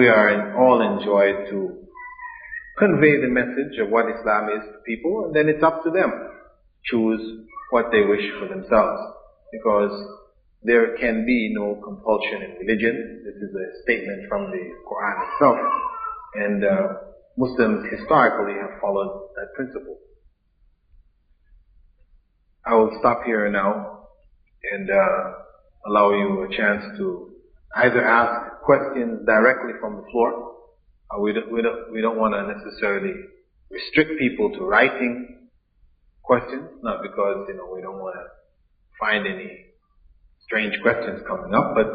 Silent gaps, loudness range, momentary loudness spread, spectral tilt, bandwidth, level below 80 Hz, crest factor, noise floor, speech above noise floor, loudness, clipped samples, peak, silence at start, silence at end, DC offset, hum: none; 7 LU; 17 LU; -4 dB/octave; 4.9 kHz; -54 dBFS; 20 dB; -62 dBFS; 41 dB; -21 LUFS; under 0.1%; -2 dBFS; 0 s; 0 s; under 0.1%; none